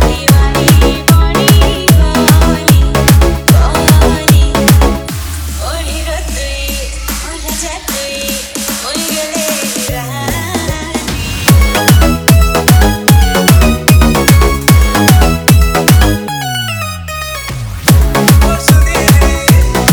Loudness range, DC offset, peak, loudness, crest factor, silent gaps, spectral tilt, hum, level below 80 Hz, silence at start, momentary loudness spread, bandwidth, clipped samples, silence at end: 8 LU; under 0.1%; 0 dBFS; -10 LUFS; 8 dB; none; -4.5 dB/octave; none; -14 dBFS; 0 s; 10 LU; over 20 kHz; 0.4%; 0 s